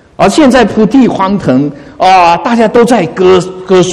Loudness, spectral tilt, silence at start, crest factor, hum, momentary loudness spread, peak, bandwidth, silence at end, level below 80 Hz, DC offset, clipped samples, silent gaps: -7 LUFS; -5.5 dB/octave; 0.2 s; 6 dB; none; 5 LU; 0 dBFS; 13 kHz; 0 s; -38 dBFS; under 0.1%; 2%; none